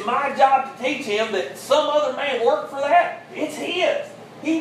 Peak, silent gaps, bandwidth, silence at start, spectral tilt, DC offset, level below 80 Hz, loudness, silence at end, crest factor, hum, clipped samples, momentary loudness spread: -4 dBFS; none; 15 kHz; 0 s; -3 dB/octave; under 0.1%; -74 dBFS; -21 LUFS; 0 s; 18 dB; none; under 0.1%; 10 LU